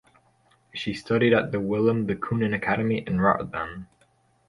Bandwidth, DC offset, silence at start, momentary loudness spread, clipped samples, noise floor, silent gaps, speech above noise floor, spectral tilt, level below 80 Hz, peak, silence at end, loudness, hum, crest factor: 11.5 kHz; under 0.1%; 0.75 s; 12 LU; under 0.1%; -64 dBFS; none; 40 dB; -7.5 dB/octave; -54 dBFS; -6 dBFS; 0.65 s; -25 LUFS; none; 20 dB